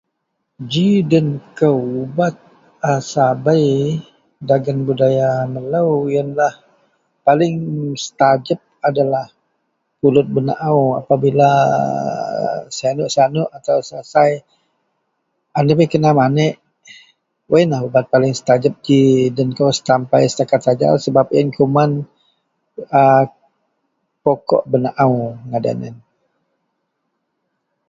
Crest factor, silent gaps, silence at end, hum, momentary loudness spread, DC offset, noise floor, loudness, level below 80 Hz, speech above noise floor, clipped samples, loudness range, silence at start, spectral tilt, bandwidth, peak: 16 dB; none; 1.9 s; none; 9 LU; under 0.1%; -73 dBFS; -16 LUFS; -56 dBFS; 58 dB; under 0.1%; 4 LU; 0.6 s; -6.5 dB/octave; 7.8 kHz; 0 dBFS